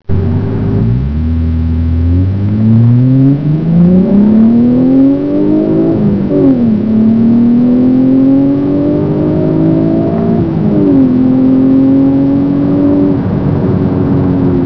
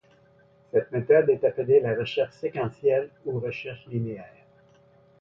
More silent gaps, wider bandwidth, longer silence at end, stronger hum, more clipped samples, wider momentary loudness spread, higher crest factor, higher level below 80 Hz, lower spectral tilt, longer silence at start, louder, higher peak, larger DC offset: neither; second, 5.4 kHz vs 6 kHz; second, 0 s vs 0.95 s; neither; first, 0.3% vs under 0.1%; second, 5 LU vs 13 LU; second, 8 dB vs 18 dB; first, -26 dBFS vs -64 dBFS; first, -12 dB/octave vs -8.5 dB/octave; second, 0.1 s vs 0.75 s; first, -9 LUFS vs -25 LUFS; first, 0 dBFS vs -8 dBFS; neither